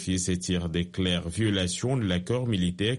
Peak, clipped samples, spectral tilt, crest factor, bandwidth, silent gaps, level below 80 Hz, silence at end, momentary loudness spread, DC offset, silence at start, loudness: -12 dBFS; under 0.1%; -5 dB/octave; 14 dB; 11.5 kHz; none; -48 dBFS; 0 s; 2 LU; under 0.1%; 0 s; -27 LUFS